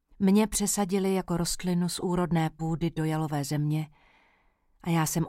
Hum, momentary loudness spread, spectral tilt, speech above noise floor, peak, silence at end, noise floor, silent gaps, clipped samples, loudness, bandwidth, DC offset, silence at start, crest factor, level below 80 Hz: none; 6 LU; -5.5 dB/octave; 40 dB; -12 dBFS; 0 s; -67 dBFS; none; under 0.1%; -28 LUFS; 16.5 kHz; under 0.1%; 0.2 s; 16 dB; -50 dBFS